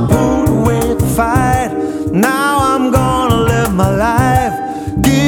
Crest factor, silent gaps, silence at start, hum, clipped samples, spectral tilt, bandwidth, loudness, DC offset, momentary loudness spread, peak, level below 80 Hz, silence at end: 12 dB; none; 0 s; none; under 0.1%; -6 dB/octave; 20 kHz; -13 LUFS; under 0.1%; 5 LU; 0 dBFS; -26 dBFS; 0 s